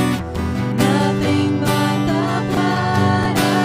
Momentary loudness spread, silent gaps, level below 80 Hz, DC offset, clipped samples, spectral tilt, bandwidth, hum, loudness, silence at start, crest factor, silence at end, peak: 5 LU; none; -38 dBFS; under 0.1%; under 0.1%; -6 dB/octave; 16 kHz; none; -18 LUFS; 0 s; 14 dB; 0 s; -4 dBFS